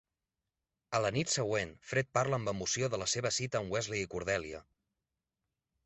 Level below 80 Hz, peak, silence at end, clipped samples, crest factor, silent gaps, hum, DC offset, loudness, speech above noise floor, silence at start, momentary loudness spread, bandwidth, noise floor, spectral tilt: -62 dBFS; -16 dBFS; 1.25 s; under 0.1%; 20 dB; none; none; under 0.1%; -34 LUFS; 55 dB; 0.9 s; 5 LU; 8.2 kHz; -90 dBFS; -3.5 dB/octave